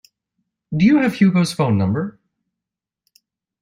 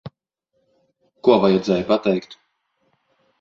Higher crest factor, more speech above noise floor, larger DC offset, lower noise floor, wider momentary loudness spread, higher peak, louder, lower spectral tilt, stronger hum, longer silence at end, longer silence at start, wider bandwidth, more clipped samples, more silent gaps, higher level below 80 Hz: about the same, 16 dB vs 20 dB; first, 70 dB vs 55 dB; neither; first, -85 dBFS vs -73 dBFS; about the same, 11 LU vs 9 LU; about the same, -4 dBFS vs -2 dBFS; about the same, -17 LUFS vs -19 LUFS; about the same, -7 dB/octave vs -7 dB/octave; neither; first, 1.5 s vs 1.1 s; first, 0.7 s vs 0.05 s; first, 14 kHz vs 7.4 kHz; neither; neither; about the same, -56 dBFS vs -58 dBFS